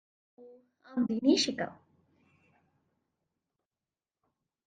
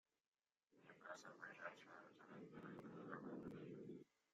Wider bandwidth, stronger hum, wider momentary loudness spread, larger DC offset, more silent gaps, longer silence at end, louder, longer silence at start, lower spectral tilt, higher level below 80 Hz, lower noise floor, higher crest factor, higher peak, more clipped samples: about the same, 9 kHz vs 8.4 kHz; neither; first, 13 LU vs 9 LU; neither; neither; first, 2.95 s vs 0.3 s; first, -30 LUFS vs -58 LUFS; second, 0.4 s vs 0.7 s; second, -3.5 dB/octave vs -6 dB/octave; first, -78 dBFS vs -90 dBFS; first, under -90 dBFS vs -80 dBFS; about the same, 22 dB vs 20 dB; first, -14 dBFS vs -38 dBFS; neither